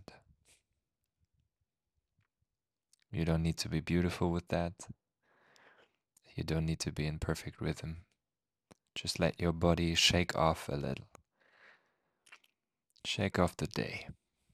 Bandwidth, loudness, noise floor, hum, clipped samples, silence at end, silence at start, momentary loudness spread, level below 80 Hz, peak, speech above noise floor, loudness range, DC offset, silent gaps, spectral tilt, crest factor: 14.5 kHz; -34 LUFS; under -90 dBFS; none; under 0.1%; 0.4 s; 3.1 s; 16 LU; -56 dBFS; -12 dBFS; over 56 dB; 7 LU; under 0.1%; none; -4.5 dB/octave; 24 dB